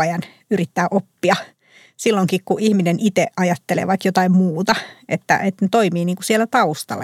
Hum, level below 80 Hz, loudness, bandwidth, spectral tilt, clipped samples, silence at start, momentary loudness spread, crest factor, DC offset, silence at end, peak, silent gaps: none; -66 dBFS; -18 LUFS; 15.5 kHz; -5.5 dB/octave; under 0.1%; 0 s; 6 LU; 16 dB; under 0.1%; 0 s; -2 dBFS; none